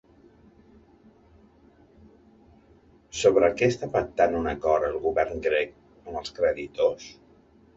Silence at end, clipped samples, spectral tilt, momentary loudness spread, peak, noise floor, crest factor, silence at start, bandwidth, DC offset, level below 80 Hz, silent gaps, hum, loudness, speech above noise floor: 0.65 s; under 0.1%; -5 dB/octave; 15 LU; -6 dBFS; -57 dBFS; 20 dB; 3.15 s; 8 kHz; under 0.1%; -52 dBFS; none; none; -25 LUFS; 33 dB